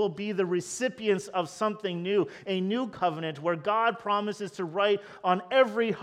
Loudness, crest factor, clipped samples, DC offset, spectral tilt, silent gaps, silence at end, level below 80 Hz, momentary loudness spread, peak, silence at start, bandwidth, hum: -28 LUFS; 18 dB; under 0.1%; under 0.1%; -5 dB/octave; none; 0 s; -74 dBFS; 7 LU; -10 dBFS; 0 s; 13 kHz; none